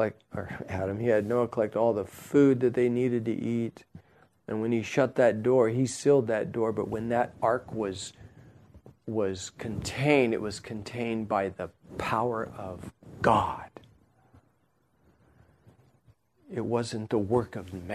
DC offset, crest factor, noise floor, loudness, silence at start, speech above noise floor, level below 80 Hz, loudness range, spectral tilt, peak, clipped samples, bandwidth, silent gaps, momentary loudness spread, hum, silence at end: under 0.1%; 22 dB; -70 dBFS; -28 LUFS; 0 s; 42 dB; -58 dBFS; 7 LU; -6.5 dB/octave; -8 dBFS; under 0.1%; 13.5 kHz; none; 15 LU; none; 0 s